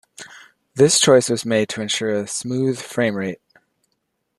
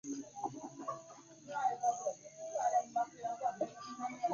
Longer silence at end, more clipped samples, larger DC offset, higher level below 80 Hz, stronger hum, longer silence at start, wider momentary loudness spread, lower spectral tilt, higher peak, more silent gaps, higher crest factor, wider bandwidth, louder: first, 1.05 s vs 0 s; neither; neither; first, -64 dBFS vs -84 dBFS; neither; first, 0.2 s vs 0.05 s; first, 23 LU vs 11 LU; about the same, -3.5 dB/octave vs -4 dB/octave; first, -2 dBFS vs -22 dBFS; neither; about the same, 20 dB vs 16 dB; first, 12.5 kHz vs 7.2 kHz; first, -19 LUFS vs -39 LUFS